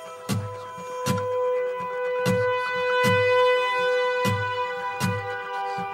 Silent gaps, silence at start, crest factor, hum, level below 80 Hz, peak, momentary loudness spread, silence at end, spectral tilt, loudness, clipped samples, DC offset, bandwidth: none; 0 s; 16 dB; none; -62 dBFS; -10 dBFS; 10 LU; 0 s; -5 dB/octave; -24 LUFS; under 0.1%; under 0.1%; 16 kHz